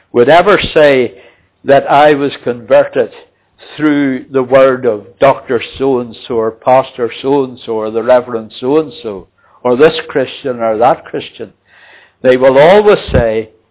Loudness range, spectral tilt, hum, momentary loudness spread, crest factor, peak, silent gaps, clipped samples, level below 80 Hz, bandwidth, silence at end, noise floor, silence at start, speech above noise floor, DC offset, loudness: 3 LU; -9.5 dB/octave; none; 13 LU; 10 dB; 0 dBFS; none; 0.4%; -36 dBFS; 4 kHz; 0.25 s; -42 dBFS; 0.15 s; 31 dB; under 0.1%; -11 LUFS